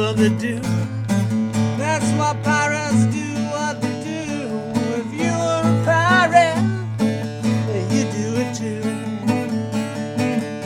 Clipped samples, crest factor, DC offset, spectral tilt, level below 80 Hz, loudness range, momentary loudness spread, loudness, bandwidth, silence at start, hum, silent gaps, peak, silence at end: under 0.1%; 18 dB; under 0.1%; -5.5 dB/octave; -56 dBFS; 4 LU; 9 LU; -20 LUFS; 14 kHz; 0 s; none; none; -2 dBFS; 0 s